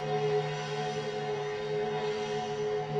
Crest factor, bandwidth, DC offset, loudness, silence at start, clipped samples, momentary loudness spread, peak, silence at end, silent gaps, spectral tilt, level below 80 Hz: 14 dB; 8.8 kHz; under 0.1%; -33 LUFS; 0 s; under 0.1%; 4 LU; -18 dBFS; 0 s; none; -5.5 dB/octave; -66 dBFS